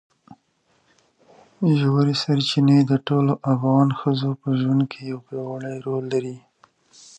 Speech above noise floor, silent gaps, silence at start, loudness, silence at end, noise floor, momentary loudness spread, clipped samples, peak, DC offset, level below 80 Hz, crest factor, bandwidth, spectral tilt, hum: 45 dB; none; 0.3 s; -21 LUFS; 0.8 s; -65 dBFS; 13 LU; under 0.1%; -4 dBFS; under 0.1%; -66 dBFS; 18 dB; 8.8 kHz; -7.5 dB/octave; none